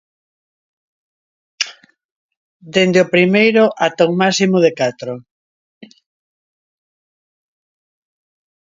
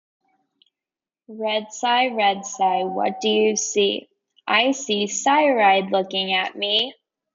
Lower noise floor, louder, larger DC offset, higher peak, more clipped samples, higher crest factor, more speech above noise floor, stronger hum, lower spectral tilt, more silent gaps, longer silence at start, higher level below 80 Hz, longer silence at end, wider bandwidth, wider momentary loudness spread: second, -40 dBFS vs under -90 dBFS; first, -14 LUFS vs -20 LUFS; neither; first, 0 dBFS vs -6 dBFS; neither; about the same, 18 dB vs 16 dB; second, 26 dB vs over 70 dB; neither; first, -5 dB/octave vs -2 dB/octave; first, 2.05-2.29 s, 2.37-2.60 s vs none; first, 1.6 s vs 1.3 s; first, -66 dBFS vs -74 dBFS; first, 3.55 s vs 0.45 s; about the same, 7.8 kHz vs 7.8 kHz; first, 12 LU vs 8 LU